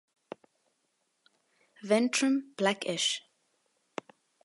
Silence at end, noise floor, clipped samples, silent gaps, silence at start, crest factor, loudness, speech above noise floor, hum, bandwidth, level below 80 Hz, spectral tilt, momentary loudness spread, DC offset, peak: 1.25 s; -77 dBFS; under 0.1%; none; 1.85 s; 22 dB; -29 LUFS; 49 dB; none; 11.5 kHz; -88 dBFS; -3 dB/octave; 23 LU; under 0.1%; -12 dBFS